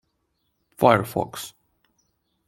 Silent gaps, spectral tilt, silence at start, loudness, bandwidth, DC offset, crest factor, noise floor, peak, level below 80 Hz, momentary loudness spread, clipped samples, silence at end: none; -5.5 dB/octave; 0.8 s; -22 LUFS; 16.5 kHz; under 0.1%; 24 dB; -73 dBFS; -2 dBFS; -62 dBFS; 18 LU; under 0.1%; 1 s